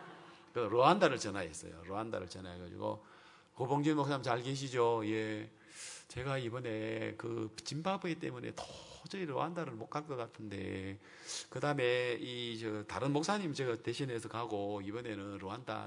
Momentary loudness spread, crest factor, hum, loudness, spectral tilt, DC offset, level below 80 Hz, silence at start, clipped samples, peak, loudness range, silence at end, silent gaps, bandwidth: 14 LU; 26 dB; none; -37 LUFS; -5 dB/octave; under 0.1%; -74 dBFS; 0 s; under 0.1%; -12 dBFS; 5 LU; 0 s; none; 11 kHz